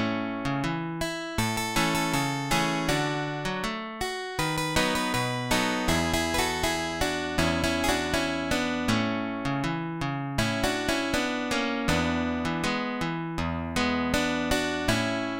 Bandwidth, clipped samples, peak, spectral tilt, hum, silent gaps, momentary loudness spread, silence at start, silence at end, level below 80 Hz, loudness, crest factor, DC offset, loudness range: 17 kHz; under 0.1%; -8 dBFS; -4 dB/octave; none; none; 5 LU; 0 s; 0 s; -44 dBFS; -27 LUFS; 20 dB; 0.2%; 2 LU